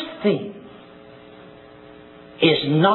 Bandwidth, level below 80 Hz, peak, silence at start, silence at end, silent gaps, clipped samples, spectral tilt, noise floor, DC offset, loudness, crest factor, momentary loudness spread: 4.3 kHz; -64 dBFS; -4 dBFS; 0 s; 0 s; none; under 0.1%; -9 dB/octave; -44 dBFS; under 0.1%; -20 LUFS; 18 dB; 27 LU